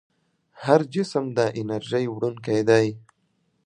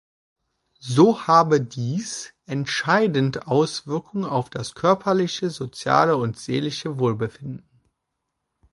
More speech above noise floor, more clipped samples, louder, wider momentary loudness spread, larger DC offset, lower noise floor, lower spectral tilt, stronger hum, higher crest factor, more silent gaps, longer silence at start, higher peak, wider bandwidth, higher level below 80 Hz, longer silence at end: second, 47 dB vs 58 dB; neither; about the same, -23 LUFS vs -22 LUFS; second, 9 LU vs 13 LU; neither; second, -70 dBFS vs -79 dBFS; about the same, -6.5 dB/octave vs -5.5 dB/octave; neither; about the same, 22 dB vs 20 dB; neither; second, 0.55 s vs 0.85 s; about the same, -2 dBFS vs -2 dBFS; second, 10 kHz vs 11.5 kHz; about the same, -66 dBFS vs -62 dBFS; second, 0.65 s vs 1.15 s